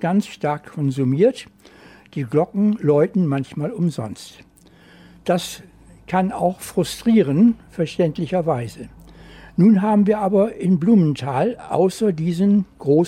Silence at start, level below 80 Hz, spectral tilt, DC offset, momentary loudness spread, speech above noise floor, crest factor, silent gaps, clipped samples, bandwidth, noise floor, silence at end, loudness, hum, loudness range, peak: 0 s; -52 dBFS; -7.5 dB/octave; under 0.1%; 14 LU; 30 dB; 14 dB; none; under 0.1%; 14.5 kHz; -49 dBFS; 0 s; -19 LUFS; none; 7 LU; -6 dBFS